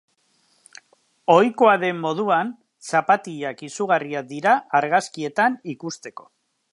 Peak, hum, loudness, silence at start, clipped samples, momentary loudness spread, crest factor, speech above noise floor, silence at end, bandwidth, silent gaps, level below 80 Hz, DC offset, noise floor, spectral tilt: -2 dBFS; none; -21 LUFS; 1.3 s; under 0.1%; 15 LU; 20 dB; 44 dB; 0.6 s; 11.5 kHz; none; -78 dBFS; under 0.1%; -64 dBFS; -5 dB/octave